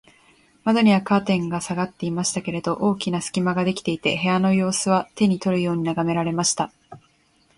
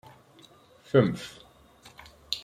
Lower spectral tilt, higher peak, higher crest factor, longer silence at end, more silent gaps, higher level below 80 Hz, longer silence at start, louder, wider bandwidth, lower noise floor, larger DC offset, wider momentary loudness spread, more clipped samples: second, -5 dB/octave vs -6.5 dB/octave; about the same, -6 dBFS vs -6 dBFS; second, 16 dB vs 24 dB; first, 0.6 s vs 0.05 s; neither; about the same, -58 dBFS vs -62 dBFS; second, 0.65 s vs 0.95 s; first, -22 LUFS vs -27 LUFS; second, 11.5 kHz vs 15 kHz; first, -61 dBFS vs -56 dBFS; neither; second, 7 LU vs 26 LU; neither